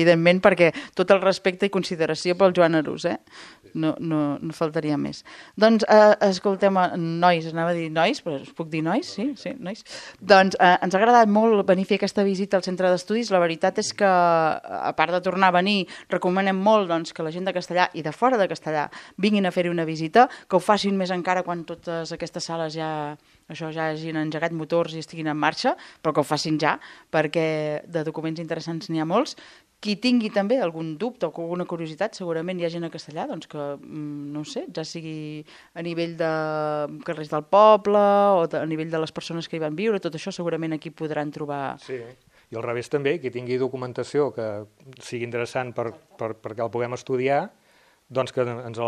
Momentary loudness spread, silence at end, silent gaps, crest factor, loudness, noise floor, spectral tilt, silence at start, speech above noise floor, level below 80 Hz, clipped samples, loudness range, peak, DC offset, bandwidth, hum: 15 LU; 0 s; none; 22 dB; -23 LUFS; -59 dBFS; -5.5 dB/octave; 0 s; 36 dB; -68 dBFS; under 0.1%; 9 LU; 0 dBFS; under 0.1%; 12.5 kHz; none